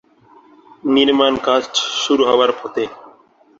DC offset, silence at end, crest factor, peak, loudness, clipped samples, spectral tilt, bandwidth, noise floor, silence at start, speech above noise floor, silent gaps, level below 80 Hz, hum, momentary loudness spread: under 0.1%; 0.6 s; 16 dB; -2 dBFS; -16 LUFS; under 0.1%; -2.5 dB/octave; 7.8 kHz; -50 dBFS; 0.85 s; 34 dB; none; -58 dBFS; none; 11 LU